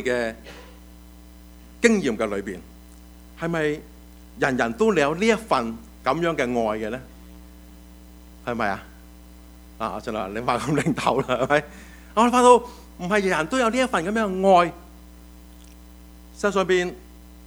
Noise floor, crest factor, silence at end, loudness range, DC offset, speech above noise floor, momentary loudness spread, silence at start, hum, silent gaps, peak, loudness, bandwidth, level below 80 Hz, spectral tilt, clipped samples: -45 dBFS; 24 dB; 0 s; 9 LU; under 0.1%; 23 dB; 17 LU; 0 s; none; none; 0 dBFS; -22 LUFS; over 20 kHz; -46 dBFS; -5 dB/octave; under 0.1%